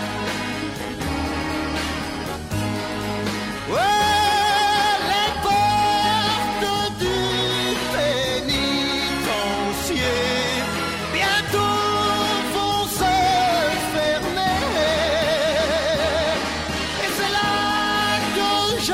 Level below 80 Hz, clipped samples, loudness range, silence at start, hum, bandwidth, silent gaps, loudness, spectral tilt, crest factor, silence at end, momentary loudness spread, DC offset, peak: -42 dBFS; under 0.1%; 3 LU; 0 s; none; 16 kHz; none; -21 LUFS; -3.5 dB/octave; 14 dB; 0 s; 8 LU; under 0.1%; -8 dBFS